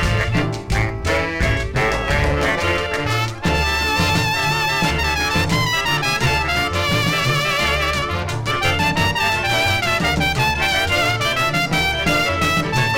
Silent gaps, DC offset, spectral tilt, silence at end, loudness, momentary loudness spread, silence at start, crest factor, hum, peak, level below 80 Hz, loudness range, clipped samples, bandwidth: none; under 0.1%; -4 dB/octave; 0 s; -18 LUFS; 3 LU; 0 s; 12 dB; none; -6 dBFS; -30 dBFS; 2 LU; under 0.1%; 16.5 kHz